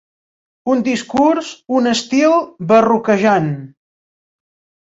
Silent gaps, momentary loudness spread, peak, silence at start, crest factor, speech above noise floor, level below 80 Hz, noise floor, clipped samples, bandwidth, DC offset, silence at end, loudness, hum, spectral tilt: none; 8 LU; -2 dBFS; 0.65 s; 16 dB; over 76 dB; -58 dBFS; under -90 dBFS; under 0.1%; 8 kHz; under 0.1%; 1.2 s; -15 LUFS; none; -5.5 dB/octave